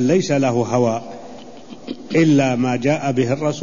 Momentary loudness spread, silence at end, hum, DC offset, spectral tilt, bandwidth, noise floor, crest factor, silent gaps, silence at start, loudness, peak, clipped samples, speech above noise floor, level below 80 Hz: 21 LU; 0 s; none; 0.8%; -6.5 dB/octave; 7.4 kHz; -38 dBFS; 14 dB; none; 0 s; -18 LUFS; -4 dBFS; under 0.1%; 21 dB; -56 dBFS